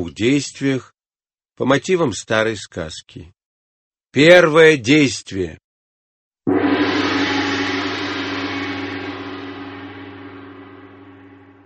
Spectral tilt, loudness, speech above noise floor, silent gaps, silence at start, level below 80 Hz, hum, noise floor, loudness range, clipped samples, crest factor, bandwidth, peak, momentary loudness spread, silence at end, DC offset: -4.5 dB/octave; -17 LUFS; over 74 dB; 1.06-1.10 s, 3.45-3.91 s, 5.64-6.31 s; 0 s; -54 dBFS; none; under -90 dBFS; 11 LU; under 0.1%; 20 dB; 8.8 kHz; 0 dBFS; 22 LU; 0.55 s; under 0.1%